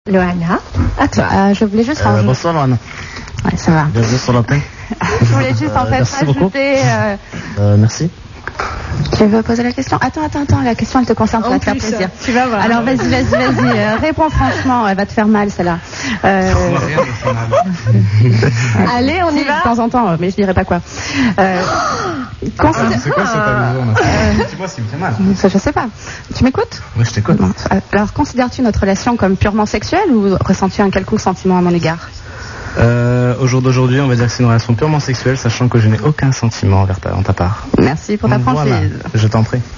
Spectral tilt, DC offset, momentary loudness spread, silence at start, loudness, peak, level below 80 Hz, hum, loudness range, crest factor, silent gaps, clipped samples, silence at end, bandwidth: -6.5 dB/octave; 0.2%; 7 LU; 0.05 s; -13 LUFS; 0 dBFS; -30 dBFS; none; 2 LU; 12 dB; none; under 0.1%; 0 s; 7.4 kHz